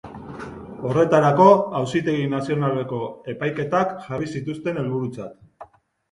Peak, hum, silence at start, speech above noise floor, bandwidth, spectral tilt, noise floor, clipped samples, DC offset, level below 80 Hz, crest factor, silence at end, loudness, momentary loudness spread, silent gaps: 0 dBFS; none; 0.05 s; 26 dB; 11 kHz; -7.5 dB/octave; -46 dBFS; under 0.1%; under 0.1%; -56 dBFS; 22 dB; 0.45 s; -21 LUFS; 21 LU; none